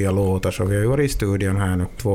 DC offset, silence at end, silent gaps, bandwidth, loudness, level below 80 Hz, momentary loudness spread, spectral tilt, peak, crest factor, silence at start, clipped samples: under 0.1%; 0 s; none; 15.5 kHz; -21 LUFS; -34 dBFS; 3 LU; -6.5 dB/octave; -8 dBFS; 12 dB; 0 s; under 0.1%